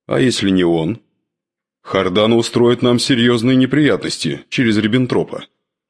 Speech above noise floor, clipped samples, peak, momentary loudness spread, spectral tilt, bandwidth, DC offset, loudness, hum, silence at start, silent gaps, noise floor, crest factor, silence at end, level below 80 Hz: 69 dB; under 0.1%; -2 dBFS; 8 LU; -5.5 dB/octave; 11 kHz; under 0.1%; -15 LUFS; none; 0.1 s; none; -84 dBFS; 14 dB; 0.45 s; -52 dBFS